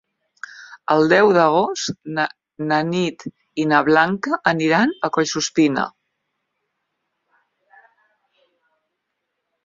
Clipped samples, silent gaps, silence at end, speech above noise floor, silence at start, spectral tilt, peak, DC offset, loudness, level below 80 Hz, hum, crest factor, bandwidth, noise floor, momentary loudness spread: under 0.1%; none; 3.75 s; 59 dB; 0.5 s; -4.5 dB/octave; -2 dBFS; under 0.1%; -18 LUFS; -64 dBFS; none; 20 dB; 7.6 kHz; -77 dBFS; 17 LU